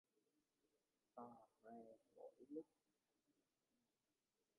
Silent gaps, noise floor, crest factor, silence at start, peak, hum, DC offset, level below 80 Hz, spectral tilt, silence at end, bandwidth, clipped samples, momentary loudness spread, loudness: none; under -90 dBFS; 24 dB; 1.15 s; -42 dBFS; none; under 0.1%; under -90 dBFS; -4.5 dB/octave; 1.95 s; 2.1 kHz; under 0.1%; 9 LU; -62 LUFS